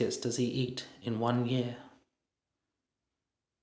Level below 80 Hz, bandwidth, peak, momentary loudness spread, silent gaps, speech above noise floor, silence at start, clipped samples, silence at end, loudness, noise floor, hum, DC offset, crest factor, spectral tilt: -72 dBFS; 8 kHz; -14 dBFS; 9 LU; none; 56 dB; 0 s; under 0.1%; 1.75 s; -33 LUFS; -89 dBFS; none; under 0.1%; 22 dB; -5.5 dB/octave